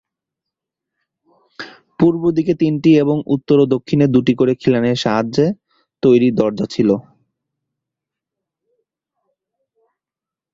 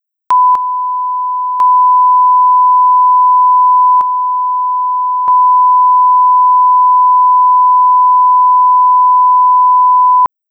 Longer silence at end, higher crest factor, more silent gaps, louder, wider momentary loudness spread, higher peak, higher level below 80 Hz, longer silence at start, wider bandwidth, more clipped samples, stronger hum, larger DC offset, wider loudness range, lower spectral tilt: first, 3.55 s vs 0.25 s; first, 16 dB vs 4 dB; neither; second, -15 LUFS vs -8 LUFS; about the same, 8 LU vs 6 LU; about the same, -2 dBFS vs -4 dBFS; first, -54 dBFS vs -66 dBFS; first, 1.6 s vs 0.3 s; first, 7.6 kHz vs 1.9 kHz; neither; neither; neither; first, 7 LU vs 2 LU; first, -7.5 dB/octave vs -3.5 dB/octave